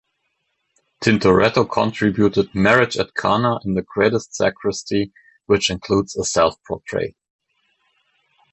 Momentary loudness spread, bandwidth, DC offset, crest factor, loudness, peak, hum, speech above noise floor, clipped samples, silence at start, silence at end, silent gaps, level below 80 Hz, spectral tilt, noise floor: 10 LU; 8.4 kHz; under 0.1%; 18 dB; -19 LUFS; -2 dBFS; none; 53 dB; under 0.1%; 1 s; 1.4 s; none; -46 dBFS; -5 dB/octave; -71 dBFS